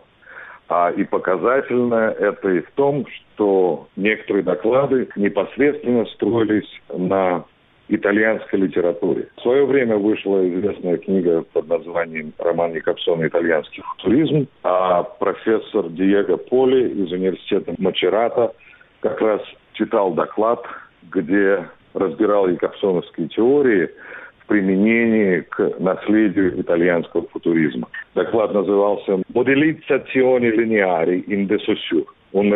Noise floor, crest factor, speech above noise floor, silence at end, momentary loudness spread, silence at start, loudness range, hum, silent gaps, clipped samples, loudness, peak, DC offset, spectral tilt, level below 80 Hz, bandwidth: -41 dBFS; 14 dB; 23 dB; 0 s; 8 LU; 0.3 s; 3 LU; none; none; under 0.1%; -19 LUFS; -4 dBFS; under 0.1%; -11 dB/octave; -60 dBFS; 4 kHz